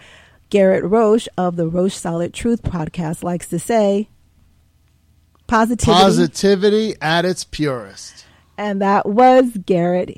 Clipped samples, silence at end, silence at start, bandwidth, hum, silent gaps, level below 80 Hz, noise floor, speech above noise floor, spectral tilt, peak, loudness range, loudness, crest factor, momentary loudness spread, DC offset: under 0.1%; 0.05 s; 0.5 s; 15.5 kHz; none; none; -42 dBFS; -56 dBFS; 40 dB; -5.5 dB/octave; -2 dBFS; 5 LU; -16 LUFS; 14 dB; 12 LU; under 0.1%